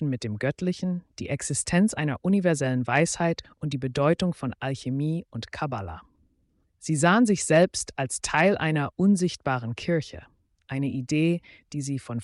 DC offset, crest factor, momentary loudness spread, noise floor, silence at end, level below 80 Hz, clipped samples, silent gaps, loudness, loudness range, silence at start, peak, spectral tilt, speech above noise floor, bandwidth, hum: under 0.1%; 16 dB; 12 LU; -69 dBFS; 0 s; -56 dBFS; under 0.1%; none; -26 LUFS; 6 LU; 0 s; -10 dBFS; -5.5 dB/octave; 43 dB; 11.5 kHz; none